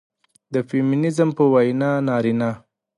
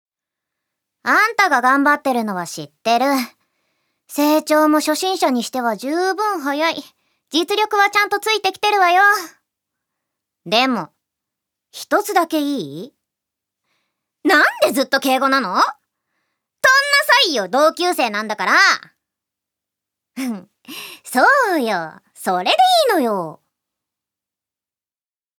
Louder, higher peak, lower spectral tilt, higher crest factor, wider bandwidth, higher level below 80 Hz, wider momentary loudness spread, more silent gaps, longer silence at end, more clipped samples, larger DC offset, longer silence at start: second, -20 LUFS vs -16 LUFS; second, -4 dBFS vs 0 dBFS; first, -8 dB/octave vs -2.5 dB/octave; about the same, 16 dB vs 18 dB; second, 11.5 kHz vs over 20 kHz; first, -64 dBFS vs -80 dBFS; second, 10 LU vs 14 LU; neither; second, 0.4 s vs 2.05 s; neither; neither; second, 0.5 s vs 1.05 s